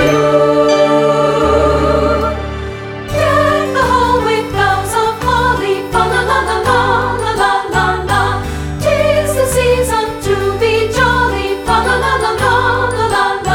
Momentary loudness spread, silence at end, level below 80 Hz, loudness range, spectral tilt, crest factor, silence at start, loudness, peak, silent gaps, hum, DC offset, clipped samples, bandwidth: 6 LU; 0 s; -28 dBFS; 1 LU; -5 dB/octave; 12 dB; 0 s; -13 LUFS; 0 dBFS; none; none; under 0.1%; under 0.1%; 19.5 kHz